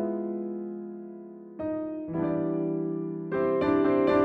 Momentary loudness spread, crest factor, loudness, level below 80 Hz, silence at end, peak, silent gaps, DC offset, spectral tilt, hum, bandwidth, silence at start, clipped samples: 17 LU; 16 dB; -29 LUFS; -60 dBFS; 0 s; -12 dBFS; none; under 0.1%; -9.5 dB/octave; none; 5.2 kHz; 0 s; under 0.1%